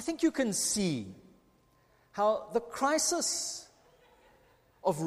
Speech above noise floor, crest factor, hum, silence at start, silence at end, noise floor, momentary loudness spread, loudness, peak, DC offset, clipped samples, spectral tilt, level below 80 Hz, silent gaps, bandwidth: 36 dB; 18 dB; none; 0 s; 0 s; -67 dBFS; 11 LU; -31 LUFS; -14 dBFS; under 0.1%; under 0.1%; -3 dB/octave; -66 dBFS; none; 15.5 kHz